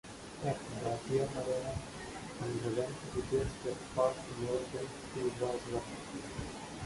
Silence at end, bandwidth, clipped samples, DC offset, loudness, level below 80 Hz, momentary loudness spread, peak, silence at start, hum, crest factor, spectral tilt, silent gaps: 0 s; 11.5 kHz; under 0.1%; under 0.1%; -38 LUFS; -56 dBFS; 9 LU; -18 dBFS; 0.05 s; none; 20 dB; -5.5 dB/octave; none